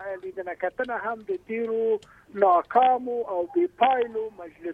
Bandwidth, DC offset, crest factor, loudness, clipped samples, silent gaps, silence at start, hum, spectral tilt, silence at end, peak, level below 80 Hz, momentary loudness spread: 4.8 kHz; under 0.1%; 20 dB; -25 LUFS; under 0.1%; none; 0 s; none; -6.5 dB/octave; 0 s; -6 dBFS; -66 dBFS; 14 LU